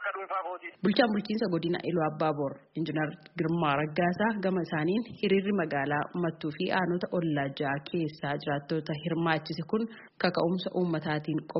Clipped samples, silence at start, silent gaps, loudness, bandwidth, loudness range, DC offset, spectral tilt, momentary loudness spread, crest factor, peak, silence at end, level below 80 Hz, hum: under 0.1%; 0 s; none; -30 LUFS; 5.8 kHz; 2 LU; under 0.1%; -5 dB/octave; 6 LU; 20 dB; -10 dBFS; 0 s; -68 dBFS; none